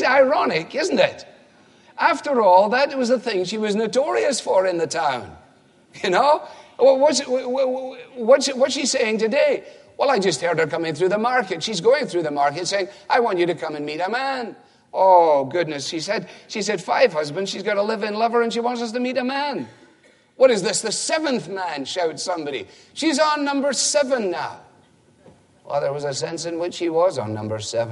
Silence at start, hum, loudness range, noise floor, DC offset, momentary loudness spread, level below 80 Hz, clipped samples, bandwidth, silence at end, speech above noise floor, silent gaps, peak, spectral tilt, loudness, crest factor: 0 s; none; 4 LU; -55 dBFS; under 0.1%; 11 LU; -70 dBFS; under 0.1%; 11.5 kHz; 0 s; 35 dB; none; -2 dBFS; -3.5 dB/octave; -20 LUFS; 18 dB